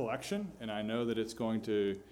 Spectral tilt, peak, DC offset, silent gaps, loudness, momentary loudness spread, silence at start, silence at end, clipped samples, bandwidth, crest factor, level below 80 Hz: -5.5 dB/octave; -22 dBFS; under 0.1%; none; -36 LUFS; 5 LU; 0 s; 0 s; under 0.1%; 16.5 kHz; 14 dB; -66 dBFS